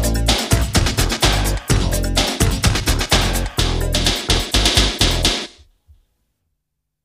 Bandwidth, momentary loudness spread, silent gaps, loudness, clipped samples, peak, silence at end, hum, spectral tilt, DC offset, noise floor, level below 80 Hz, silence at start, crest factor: 15.5 kHz; 5 LU; none; -17 LUFS; under 0.1%; 0 dBFS; 1.55 s; none; -3.5 dB/octave; under 0.1%; -76 dBFS; -22 dBFS; 0 s; 18 dB